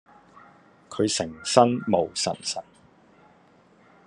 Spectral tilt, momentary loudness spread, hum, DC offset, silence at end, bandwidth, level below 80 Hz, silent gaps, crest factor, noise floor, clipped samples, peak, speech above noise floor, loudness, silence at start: -4 dB/octave; 12 LU; none; under 0.1%; 1.45 s; 11 kHz; -68 dBFS; none; 26 dB; -57 dBFS; under 0.1%; -2 dBFS; 34 dB; -24 LUFS; 0.9 s